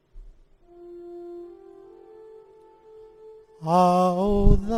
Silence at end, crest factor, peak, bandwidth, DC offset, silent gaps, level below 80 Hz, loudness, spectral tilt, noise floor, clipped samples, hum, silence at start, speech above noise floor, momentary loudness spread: 0 s; 22 dB; -4 dBFS; 10.5 kHz; under 0.1%; none; -30 dBFS; -21 LUFS; -8 dB/octave; -52 dBFS; under 0.1%; none; 0.15 s; 34 dB; 24 LU